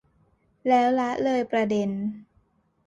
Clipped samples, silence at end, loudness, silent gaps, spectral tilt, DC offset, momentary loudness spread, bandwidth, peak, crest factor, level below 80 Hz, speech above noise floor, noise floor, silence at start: under 0.1%; 0.65 s; -25 LUFS; none; -6.5 dB/octave; under 0.1%; 11 LU; 7.8 kHz; -10 dBFS; 16 dB; -64 dBFS; 42 dB; -66 dBFS; 0.65 s